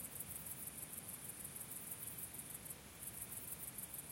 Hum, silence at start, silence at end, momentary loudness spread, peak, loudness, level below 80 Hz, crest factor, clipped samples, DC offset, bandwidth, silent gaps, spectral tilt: none; 0 s; 0 s; 3 LU; -30 dBFS; -47 LUFS; -70 dBFS; 20 dB; under 0.1%; under 0.1%; 16.5 kHz; none; -2 dB/octave